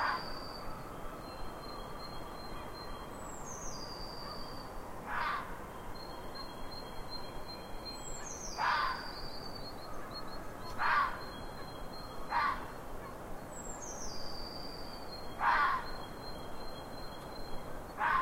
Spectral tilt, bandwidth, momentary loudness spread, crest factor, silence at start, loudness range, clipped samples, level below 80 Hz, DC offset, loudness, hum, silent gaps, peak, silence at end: -3 dB/octave; 16 kHz; 14 LU; 22 dB; 0 s; 8 LU; under 0.1%; -50 dBFS; under 0.1%; -40 LUFS; none; none; -18 dBFS; 0 s